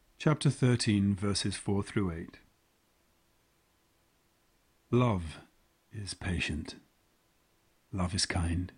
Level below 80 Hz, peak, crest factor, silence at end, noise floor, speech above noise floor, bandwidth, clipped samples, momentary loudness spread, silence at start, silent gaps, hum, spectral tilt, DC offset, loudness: -54 dBFS; -14 dBFS; 20 dB; 0.1 s; -71 dBFS; 40 dB; 10.5 kHz; under 0.1%; 17 LU; 0.2 s; none; none; -5.5 dB/octave; under 0.1%; -31 LUFS